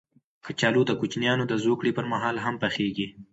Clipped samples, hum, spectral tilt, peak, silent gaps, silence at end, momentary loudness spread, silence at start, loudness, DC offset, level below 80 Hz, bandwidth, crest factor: under 0.1%; none; -5.5 dB/octave; -10 dBFS; none; 0.1 s; 7 LU; 0.45 s; -26 LUFS; under 0.1%; -64 dBFS; 8 kHz; 18 dB